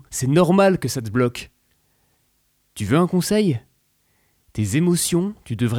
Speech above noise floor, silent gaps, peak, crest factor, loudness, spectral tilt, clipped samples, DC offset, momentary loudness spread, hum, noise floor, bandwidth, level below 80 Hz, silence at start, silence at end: 47 dB; none; -6 dBFS; 16 dB; -20 LUFS; -5.5 dB/octave; under 0.1%; under 0.1%; 14 LU; none; -66 dBFS; 17 kHz; -52 dBFS; 0.1 s; 0 s